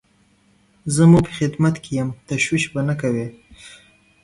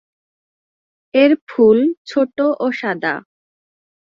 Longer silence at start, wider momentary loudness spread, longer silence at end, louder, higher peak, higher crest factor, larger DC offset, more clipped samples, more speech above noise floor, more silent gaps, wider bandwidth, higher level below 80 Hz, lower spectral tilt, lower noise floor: second, 0.85 s vs 1.15 s; first, 12 LU vs 9 LU; second, 0.55 s vs 0.95 s; second, -19 LUFS vs -16 LUFS; about the same, -2 dBFS vs -2 dBFS; about the same, 18 dB vs 16 dB; neither; neither; second, 40 dB vs over 75 dB; second, none vs 1.41-1.47 s, 1.97-2.05 s; first, 11.5 kHz vs 7.2 kHz; first, -48 dBFS vs -62 dBFS; about the same, -6 dB/octave vs -6.5 dB/octave; second, -58 dBFS vs under -90 dBFS